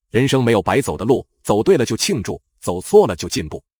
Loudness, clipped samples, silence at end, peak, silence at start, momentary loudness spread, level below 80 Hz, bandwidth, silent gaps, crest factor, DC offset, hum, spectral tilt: -18 LUFS; under 0.1%; 0.2 s; 0 dBFS; 0.15 s; 11 LU; -44 dBFS; over 20 kHz; none; 16 dB; under 0.1%; none; -5 dB/octave